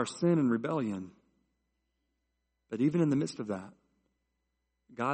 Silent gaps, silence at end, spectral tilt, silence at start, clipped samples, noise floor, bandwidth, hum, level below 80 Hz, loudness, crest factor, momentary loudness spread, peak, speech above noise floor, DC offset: none; 0 s; -7 dB/octave; 0 s; under 0.1%; -82 dBFS; 8.4 kHz; none; -74 dBFS; -31 LUFS; 18 dB; 15 LU; -16 dBFS; 51 dB; under 0.1%